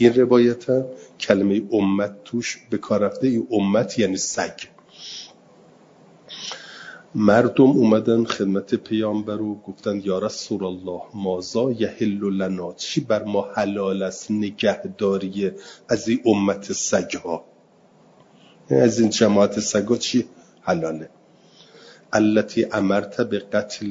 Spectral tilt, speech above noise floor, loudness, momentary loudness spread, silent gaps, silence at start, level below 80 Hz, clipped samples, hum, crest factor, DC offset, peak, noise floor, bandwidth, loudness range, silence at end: -5 dB/octave; 34 dB; -21 LUFS; 15 LU; none; 0 s; -62 dBFS; under 0.1%; none; 22 dB; under 0.1%; 0 dBFS; -54 dBFS; 7.8 kHz; 5 LU; 0 s